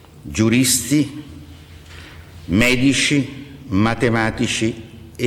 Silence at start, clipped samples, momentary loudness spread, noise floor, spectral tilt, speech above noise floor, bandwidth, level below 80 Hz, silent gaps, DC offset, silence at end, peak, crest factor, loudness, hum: 0.15 s; under 0.1%; 23 LU; -40 dBFS; -4 dB/octave; 22 dB; 17.5 kHz; -40 dBFS; none; under 0.1%; 0 s; -4 dBFS; 16 dB; -17 LUFS; none